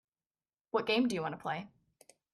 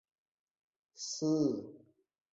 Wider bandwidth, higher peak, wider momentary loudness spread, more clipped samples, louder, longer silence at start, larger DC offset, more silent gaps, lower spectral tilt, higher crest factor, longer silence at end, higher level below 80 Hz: first, 12.5 kHz vs 8 kHz; about the same, -18 dBFS vs -20 dBFS; second, 11 LU vs 14 LU; neither; about the same, -34 LUFS vs -35 LUFS; second, 0.75 s vs 1 s; neither; neither; about the same, -5 dB/octave vs -6 dB/octave; about the same, 20 dB vs 18 dB; about the same, 0.65 s vs 0.55 s; about the same, -76 dBFS vs -78 dBFS